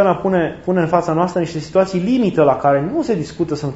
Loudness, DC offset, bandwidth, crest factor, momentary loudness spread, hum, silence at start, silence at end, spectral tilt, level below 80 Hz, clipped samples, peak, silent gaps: -17 LUFS; 0.2%; 8 kHz; 16 dB; 7 LU; none; 0 s; 0 s; -7.5 dB/octave; -48 dBFS; under 0.1%; 0 dBFS; none